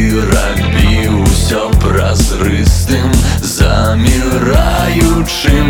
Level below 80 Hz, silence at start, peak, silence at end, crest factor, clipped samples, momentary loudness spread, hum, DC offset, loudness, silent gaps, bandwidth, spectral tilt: -14 dBFS; 0 s; 0 dBFS; 0 s; 10 dB; under 0.1%; 2 LU; none; under 0.1%; -11 LUFS; none; 18.5 kHz; -5 dB/octave